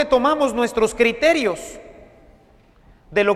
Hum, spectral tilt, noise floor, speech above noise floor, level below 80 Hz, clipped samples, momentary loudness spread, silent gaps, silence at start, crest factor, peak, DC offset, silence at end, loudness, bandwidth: none; -4 dB/octave; -52 dBFS; 34 dB; -46 dBFS; under 0.1%; 15 LU; none; 0 s; 18 dB; -2 dBFS; under 0.1%; 0 s; -19 LUFS; 14.5 kHz